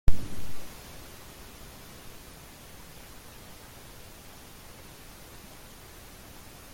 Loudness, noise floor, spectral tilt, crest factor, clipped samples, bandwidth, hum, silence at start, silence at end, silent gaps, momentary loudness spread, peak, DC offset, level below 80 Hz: -46 LUFS; -48 dBFS; -4 dB/octave; 22 dB; under 0.1%; 16.5 kHz; none; 0.05 s; 4.65 s; none; 4 LU; -6 dBFS; under 0.1%; -38 dBFS